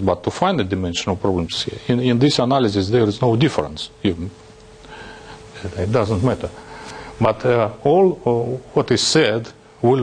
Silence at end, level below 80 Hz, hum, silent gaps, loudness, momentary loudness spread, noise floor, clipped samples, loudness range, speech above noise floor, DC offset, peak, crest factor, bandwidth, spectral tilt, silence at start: 0 s; -48 dBFS; none; none; -19 LUFS; 19 LU; -42 dBFS; under 0.1%; 6 LU; 24 dB; under 0.1%; -2 dBFS; 16 dB; 10 kHz; -5.5 dB/octave; 0 s